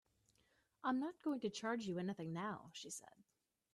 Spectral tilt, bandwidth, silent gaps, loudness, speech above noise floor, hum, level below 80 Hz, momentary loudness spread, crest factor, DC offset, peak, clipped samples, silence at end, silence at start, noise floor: -5 dB/octave; 13 kHz; none; -44 LUFS; 35 dB; none; -84 dBFS; 9 LU; 18 dB; under 0.1%; -28 dBFS; under 0.1%; 0.5 s; 0.85 s; -79 dBFS